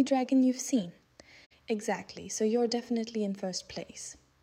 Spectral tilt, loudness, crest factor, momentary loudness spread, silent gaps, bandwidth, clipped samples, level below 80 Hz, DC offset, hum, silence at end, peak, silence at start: -4.5 dB/octave; -31 LUFS; 16 dB; 16 LU; 1.46-1.50 s; 15.5 kHz; under 0.1%; -70 dBFS; under 0.1%; none; 0.3 s; -16 dBFS; 0 s